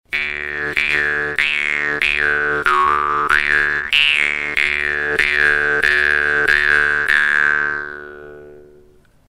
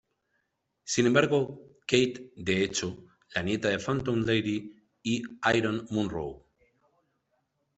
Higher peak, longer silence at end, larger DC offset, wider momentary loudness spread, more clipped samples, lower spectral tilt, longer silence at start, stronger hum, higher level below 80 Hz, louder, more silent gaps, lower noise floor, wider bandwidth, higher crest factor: first, 0 dBFS vs -6 dBFS; second, 0.7 s vs 1.4 s; neither; second, 7 LU vs 14 LU; neither; second, -2.5 dB/octave vs -4.5 dB/octave; second, 0.1 s vs 0.85 s; neither; first, -44 dBFS vs -60 dBFS; first, -15 LUFS vs -29 LUFS; neither; second, -49 dBFS vs -78 dBFS; first, 15.5 kHz vs 8.4 kHz; second, 18 dB vs 24 dB